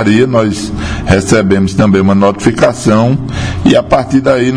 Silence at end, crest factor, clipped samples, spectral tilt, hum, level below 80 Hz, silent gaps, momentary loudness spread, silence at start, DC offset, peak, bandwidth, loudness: 0 s; 10 dB; 1%; -6 dB/octave; none; -28 dBFS; none; 7 LU; 0 s; 0.8%; 0 dBFS; 10.5 kHz; -10 LUFS